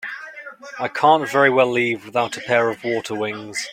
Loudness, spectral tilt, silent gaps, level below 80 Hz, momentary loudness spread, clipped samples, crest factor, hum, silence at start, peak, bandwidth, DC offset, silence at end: -19 LUFS; -4 dB/octave; none; -66 dBFS; 17 LU; under 0.1%; 18 dB; none; 0 s; -2 dBFS; 16 kHz; under 0.1%; 0 s